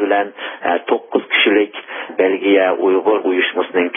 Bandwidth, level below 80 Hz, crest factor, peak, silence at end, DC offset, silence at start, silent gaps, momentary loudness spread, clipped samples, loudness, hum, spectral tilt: 3.7 kHz; -68 dBFS; 14 dB; -2 dBFS; 0 s; under 0.1%; 0 s; none; 9 LU; under 0.1%; -16 LUFS; none; -9 dB/octave